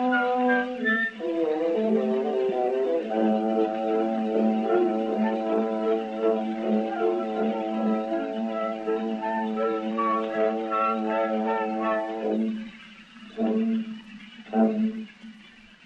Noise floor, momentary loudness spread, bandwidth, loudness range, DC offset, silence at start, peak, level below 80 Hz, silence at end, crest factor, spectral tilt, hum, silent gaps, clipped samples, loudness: -50 dBFS; 7 LU; 7.2 kHz; 4 LU; under 0.1%; 0 s; -10 dBFS; -70 dBFS; 0.35 s; 16 dB; -7.5 dB/octave; none; none; under 0.1%; -26 LUFS